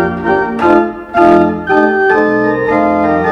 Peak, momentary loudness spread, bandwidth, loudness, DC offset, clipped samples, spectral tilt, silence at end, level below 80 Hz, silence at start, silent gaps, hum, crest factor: 0 dBFS; 5 LU; 7.4 kHz; -11 LUFS; under 0.1%; 0.3%; -8 dB/octave; 0 s; -40 dBFS; 0 s; none; none; 10 dB